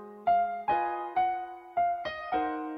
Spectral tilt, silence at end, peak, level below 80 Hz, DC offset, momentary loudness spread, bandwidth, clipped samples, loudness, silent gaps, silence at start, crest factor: -6.5 dB/octave; 0 s; -16 dBFS; -64 dBFS; under 0.1%; 7 LU; 5.4 kHz; under 0.1%; -30 LUFS; none; 0 s; 14 dB